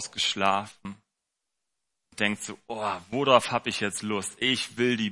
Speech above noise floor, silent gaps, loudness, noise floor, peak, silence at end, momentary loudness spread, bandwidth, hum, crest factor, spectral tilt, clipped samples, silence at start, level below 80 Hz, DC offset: 57 dB; none; -27 LUFS; -84 dBFS; -4 dBFS; 0 s; 15 LU; 11.5 kHz; none; 24 dB; -3 dB/octave; under 0.1%; 0 s; -70 dBFS; under 0.1%